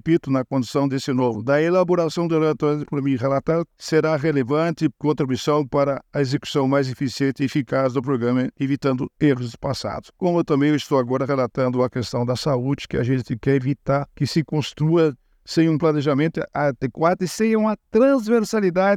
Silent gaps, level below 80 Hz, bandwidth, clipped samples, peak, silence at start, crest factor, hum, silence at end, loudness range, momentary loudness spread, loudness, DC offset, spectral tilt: none; -52 dBFS; 14.5 kHz; under 0.1%; -6 dBFS; 0.05 s; 16 dB; none; 0 s; 2 LU; 5 LU; -21 LUFS; under 0.1%; -7 dB/octave